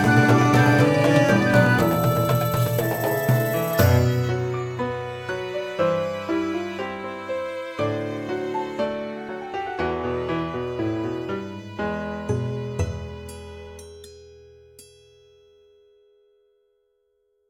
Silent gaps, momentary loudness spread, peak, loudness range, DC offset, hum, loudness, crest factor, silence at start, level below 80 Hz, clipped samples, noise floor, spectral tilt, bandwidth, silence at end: none; 15 LU; -4 dBFS; 12 LU; under 0.1%; none; -23 LUFS; 20 dB; 0 s; -48 dBFS; under 0.1%; -69 dBFS; -6.5 dB/octave; 17.5 kHz; 2.65 s